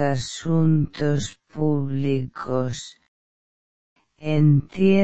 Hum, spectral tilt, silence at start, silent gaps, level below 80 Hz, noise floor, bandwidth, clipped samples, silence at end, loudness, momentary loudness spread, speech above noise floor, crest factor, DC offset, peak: none; -7 dB/octave; 0 s; 3.08-3.96 s; -50 dBFS; under -90 dBFS; 8.4 kHz; under 0.1%; 0 s; -22 LUFS; 12 LU; over 69 dB; 16 dB; 1%; -6 dBFS